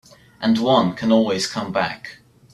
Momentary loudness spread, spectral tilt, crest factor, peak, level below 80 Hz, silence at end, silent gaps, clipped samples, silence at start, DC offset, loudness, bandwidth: 10 LU; -5 dB/octave; 18 dB; -2 dBFS; -58 dBFS; 0.4 s; none; under 0.1%; 0.4 s; under 0.1%; -19 LUFS; 12.5 kHz